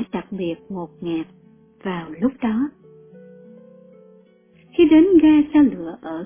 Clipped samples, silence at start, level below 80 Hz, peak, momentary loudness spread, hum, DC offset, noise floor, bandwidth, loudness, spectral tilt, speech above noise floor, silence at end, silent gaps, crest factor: under 0.1%; 0 s; -52 dBFS; -4 dBFS; 18 LU; none; under 0.1%; -53 dBFS; 3.6 kHz; -18 LUFS; -11 dB/octave; 35 dB; 0 s; none; 16 dB